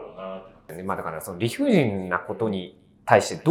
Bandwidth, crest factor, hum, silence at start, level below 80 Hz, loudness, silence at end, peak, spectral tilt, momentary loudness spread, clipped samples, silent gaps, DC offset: 17.5 kHz; 24 dB; none; 0 s; -64 dBFS; -24 LUFS; 0 s; 0 dBFS; -6 dB/octave; 17 LU; under 0.1%; none; under 0.1%